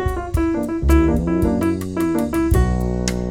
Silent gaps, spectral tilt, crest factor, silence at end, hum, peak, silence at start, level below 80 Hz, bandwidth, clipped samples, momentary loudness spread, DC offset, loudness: none; -7 dB/octave; 14 dB; 0 s; none; -4 dBFS; 0 s; -24 dBFS; 17 kHz; under 0.1%; 5 LU; under 0.1%; -19 LUFS